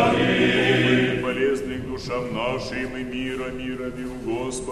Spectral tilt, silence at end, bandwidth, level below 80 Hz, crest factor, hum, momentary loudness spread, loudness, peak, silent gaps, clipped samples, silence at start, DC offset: -5.5 dB/octave; 0 s; 13 kHz; -44 dBFS; 18 dB; none; 12 LU; -23 LUFS; -6 dBFS; none; under 0.1%; 0 s; under 0.1%